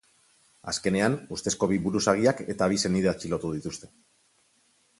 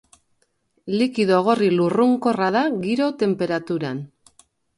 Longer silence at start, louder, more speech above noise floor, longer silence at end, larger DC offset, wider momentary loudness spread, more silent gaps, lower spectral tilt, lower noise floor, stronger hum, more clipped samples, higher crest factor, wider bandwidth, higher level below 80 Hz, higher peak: second, 0.65 s vs 0.85 s; second, -26 LUFS vs -20 LUFS; second, 40 dB vs 48 dB; first, 1.15 s vs 0.7 s; neither; about the same, 10 LU vs 10 LU; neither; second, -4.5 dB/octave vs -7 dB/octave; about the same, -66 dBFS vs -67 dBFS; neither; neither; first, 22 dB vs 16 dB; about the same, 11.5 kHz vs 11.5 kHz; first, -54 dBFS vs -64 dBFS; about the same, -6 dBFS vs -4 dBFS